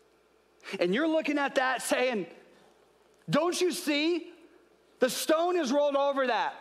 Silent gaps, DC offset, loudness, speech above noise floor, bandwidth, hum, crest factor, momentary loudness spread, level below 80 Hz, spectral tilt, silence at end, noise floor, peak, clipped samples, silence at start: none; under 0.1%; -28 LUFS; 37 dB; 15.5 kHz; none; 16 dB; 9 LU; -82 dBFS; -3.5 dB/octave; 0 s; -65 dBFS; -14 dBFS; under 0.1%; 0.65 s